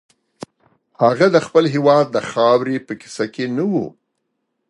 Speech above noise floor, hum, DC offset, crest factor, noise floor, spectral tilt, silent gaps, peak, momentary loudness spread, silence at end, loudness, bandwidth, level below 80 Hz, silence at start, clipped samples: 57 dB; none; under 0.1%; 18 dB; -73 dBFS; -6 dB/octave; none; 0 dBFS; 11 LU; 0.8 s; -17 LUFS; 11 kHz; -64 dBFS; 1 s; under 0.1%